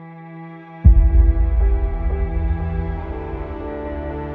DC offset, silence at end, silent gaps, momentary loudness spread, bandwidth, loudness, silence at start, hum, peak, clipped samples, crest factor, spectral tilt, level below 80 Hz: under 0.1%; 0 s; none; 21 LU; 3 kHz; -20 LUFS; 0 s; none; 0 dBFS; under 0.1%; 18 dB; -12 dB/octave; -18 dBFS